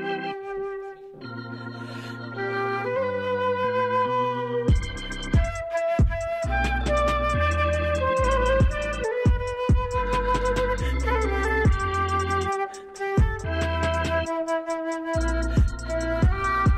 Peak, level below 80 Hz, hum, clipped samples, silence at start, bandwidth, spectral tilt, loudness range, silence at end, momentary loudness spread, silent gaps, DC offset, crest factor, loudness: -10 dBFS; -30 dBFS; none; under 0.1%; 0 s; 11.5 kHz; -6 dB/octave; 3 LU; 0 s; 10 LU; none; under 0.1%; 14 dB; -25 LUFS